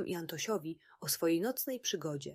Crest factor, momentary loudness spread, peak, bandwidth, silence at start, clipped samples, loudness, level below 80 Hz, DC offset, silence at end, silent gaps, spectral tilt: 16 dB; 8 LU; -20 dBFS; 16 kHz; 0 s; under 0.1%; -35 LUFS; -78 dBFS; under 0.1%; 0 s; none; -3.5 dB/octave